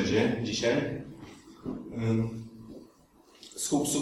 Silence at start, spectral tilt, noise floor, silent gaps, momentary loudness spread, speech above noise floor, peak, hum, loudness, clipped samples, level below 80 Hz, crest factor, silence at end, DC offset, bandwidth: 0 s; -4.5 dB/octave; -59 dBFS; none; 21 LU; 30 dB; -12 dBFS; none; -30 LUFS; under 0.1%; -58 dBFS; 18 dB; 0 s; under 0.1%; 15.5 kHz